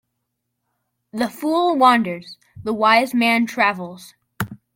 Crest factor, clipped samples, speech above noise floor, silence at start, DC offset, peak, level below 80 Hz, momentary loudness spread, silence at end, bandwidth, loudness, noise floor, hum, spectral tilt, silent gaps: 20 dB; under 0.1%; 58 dB; 1.15 s; under 0.1%; -2 dBFS; -60 dBFS; 16 LU; 0.2 s; 16.5 kHz; -18 LUFS; -76 dBFS; none; -4.5 dB/octave; none